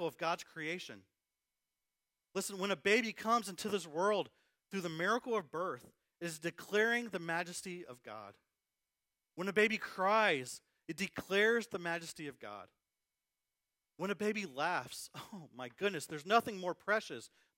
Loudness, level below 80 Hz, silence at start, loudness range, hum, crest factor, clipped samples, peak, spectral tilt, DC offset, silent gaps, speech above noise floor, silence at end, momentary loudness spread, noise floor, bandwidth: -36 LUFS; -82 dBFS; 0 s; 6 LU; none; 22 dB; under 0.1%; -16 dBFS; -3.5 dB/octave; under 0.1%; none; over 53 dB; 0.3 s; 18 LU; under -90 dBFS; 16 kHz